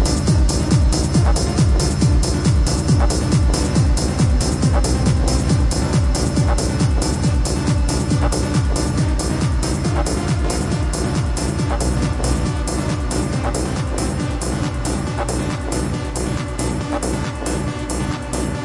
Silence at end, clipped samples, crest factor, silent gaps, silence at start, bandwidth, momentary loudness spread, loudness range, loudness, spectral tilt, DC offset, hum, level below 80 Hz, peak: 0 s; under 0.1%; 14 dB; none; 0 s; 11.5 kHz; 6 LU; 5 LU; -19 LUFS; -5.5 dB/octave; under 0.1%; none; -22 dBFS; -4 dBFS